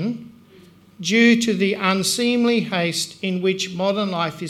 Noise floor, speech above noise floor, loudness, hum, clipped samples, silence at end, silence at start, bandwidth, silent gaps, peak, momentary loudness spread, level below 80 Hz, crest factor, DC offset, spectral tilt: -49 dBFS; 29 dB; -20 LUFS; none; under 0.1%; 0 s; 0 s; 15 kHz; none; -2 dBFS; 9 LU; -64 dBFS; 18 dB; under 0.1%; -4 dB/octave